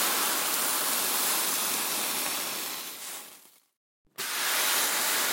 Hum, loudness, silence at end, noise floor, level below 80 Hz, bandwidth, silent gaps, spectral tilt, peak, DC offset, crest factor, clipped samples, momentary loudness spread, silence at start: none; -26 LUFS; 0 s; -54 dBFS; -86 dBFS; 17 kHz; 3.77-4.05 s; 1 dB/octave; -8 dBFS; under 0.1%; 22 dB; under 0.1%; 13 LU; 0 s